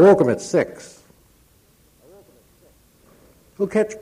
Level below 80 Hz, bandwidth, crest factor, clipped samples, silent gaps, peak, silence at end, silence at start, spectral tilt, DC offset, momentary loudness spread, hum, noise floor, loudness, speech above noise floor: -60 dBFS; 13.5 kHz; 20 dB; under 0.1%; none; -2 dBFS; 0.05 s; 0 s; -6.5 dB/octave; under 0.1%; 23 LU; none; -56 dBFS; -20 LUFS; 39 dB